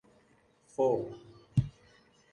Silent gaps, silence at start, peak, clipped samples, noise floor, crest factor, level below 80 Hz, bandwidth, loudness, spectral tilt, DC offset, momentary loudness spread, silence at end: none; 0.8 s; -16 dBFS; under 0.1%; -67 dBFS; 20 dB; -56 dBFS; 11 kHz; -33 LUFS; -9 dB/octave; under 0.1%; 15 LU; 0.65 s